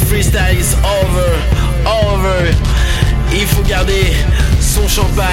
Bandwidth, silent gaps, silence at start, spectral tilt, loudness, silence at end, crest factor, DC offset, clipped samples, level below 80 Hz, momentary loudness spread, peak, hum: 17 kHz; none; 0 s; -4.5 dB/octave; -13 LUFS; 0 s; 12 dB; under 0.1%; under 0.1%; -14 dBFS; 2 LU; 0 dBFS; none